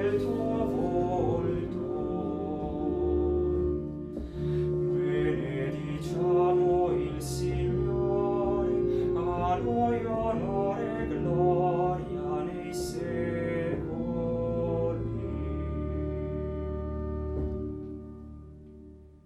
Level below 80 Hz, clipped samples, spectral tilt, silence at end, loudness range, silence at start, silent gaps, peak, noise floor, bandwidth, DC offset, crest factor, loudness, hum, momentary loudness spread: -42 dBFS; under 0.1%; -8 dB/octave; 0.1 s; 5 LU; 0 s; none; -14 dBFS; -50 dBFS; 13 kHz; under 0.1%; 16 dB; -30 LUFS; none; 8 LU